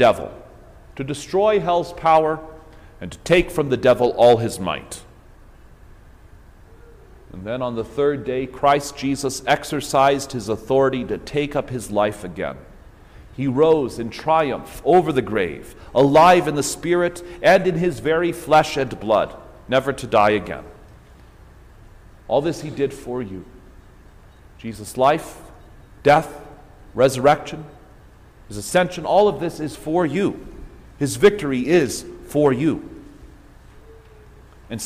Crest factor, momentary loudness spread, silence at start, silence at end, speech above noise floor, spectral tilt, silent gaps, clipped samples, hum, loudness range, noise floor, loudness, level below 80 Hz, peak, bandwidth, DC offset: 18 dB; 17 LU; 0 s; 0 s; 27 dB; -5 dB/octave; none; under 0.1%; none; 9 LU; -46 dBFS; -19 LUFS; -46 dBFS; -2 dBFS; 16 kHz; under 0.1%